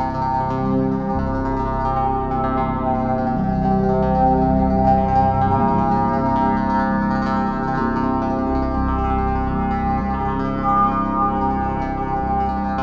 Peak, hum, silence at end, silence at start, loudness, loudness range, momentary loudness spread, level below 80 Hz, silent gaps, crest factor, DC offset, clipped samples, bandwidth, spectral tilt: -4 dBFS; none; 0 s; 0 s; -19 LUFS; 3 LU; 5 LU; -30 dBFS; none; 14 dB; under 0.1%; under 0.1%; 7 kHz; -9.5 dB/octave